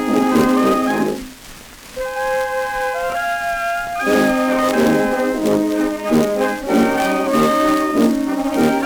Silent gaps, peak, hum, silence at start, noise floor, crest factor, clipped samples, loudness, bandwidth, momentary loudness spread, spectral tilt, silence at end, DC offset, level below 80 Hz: none; -2 dBFS; none; 0 s; -38 dBFS; 14 dB; under 0.1%; -17 LUFS; over 20 kHz; 8 LU; -5 dB/octave; 0 s; under 0.1%; -44 dBFS